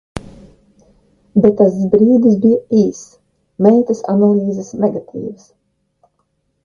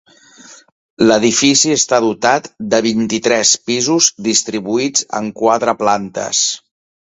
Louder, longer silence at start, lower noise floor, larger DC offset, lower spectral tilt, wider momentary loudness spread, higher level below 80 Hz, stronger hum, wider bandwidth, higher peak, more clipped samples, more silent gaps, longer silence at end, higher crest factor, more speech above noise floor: about the same, -13 LUFS vs -14 LUFS; second, 0.15 s vs 0.5 s; first, -66 dBFS vs -42 dBFS; neither; first, -9 dB/octave vs -2.5 dB/octave; first, 17 LU vs 7 LU; first, -50 dBFS vs -56 dBFS; neither; second, 7.4 kHz vs 8.2 kHz; about the same, 0 dBFS vs 0 dBFS; neither; second, none vs 0.72-0.97 s; first, 1.3 s vs 0.45 s; about the same, 14 dB vs 16 dB; first, 53 dB vs 28 dB